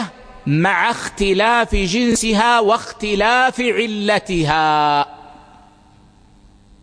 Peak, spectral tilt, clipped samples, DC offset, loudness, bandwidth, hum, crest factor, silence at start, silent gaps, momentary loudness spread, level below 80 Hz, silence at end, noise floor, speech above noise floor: 0 dBFS; -4 dB/octave; under 0.1%; under 0.1%; -16 LUFS; 10.5 kHz; none; 18 dB; 0 s; none; 6 LU; -36 dBFS; 1.5 s; -49 dBFS; 32 dB